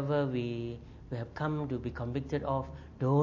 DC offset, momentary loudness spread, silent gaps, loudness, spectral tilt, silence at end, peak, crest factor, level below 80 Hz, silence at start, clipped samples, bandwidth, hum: under 0.1%; 11 LU; none; -35 LUFS; -9 dB/octave; 0 s; -14 dBFS; 18 dB; -52 dBFS; 0 s; under 0.1%; 7.2 kHz; none